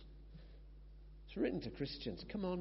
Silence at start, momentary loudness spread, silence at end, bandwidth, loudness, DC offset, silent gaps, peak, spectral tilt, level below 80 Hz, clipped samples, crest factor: 0 s; 20 LU; 0 s; 5.8 kHz; -43 LUFS; under 0.1%; none; -26 dBFS; -5.5 dB/octave; -56 dBFS; under 0.1%; 18 dB